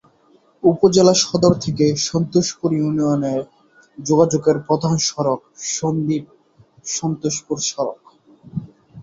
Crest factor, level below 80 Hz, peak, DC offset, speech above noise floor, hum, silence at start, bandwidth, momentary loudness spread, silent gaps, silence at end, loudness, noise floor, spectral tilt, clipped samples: 18 dB; -54 dBFS; -2 dBFS; under 0.1%; 38 dB; none; 0.65 s; 8 kHz; 12 LU; none; 0 s; -18 LUFS; -55 dBFS; -5 dB/octave; under 0.1%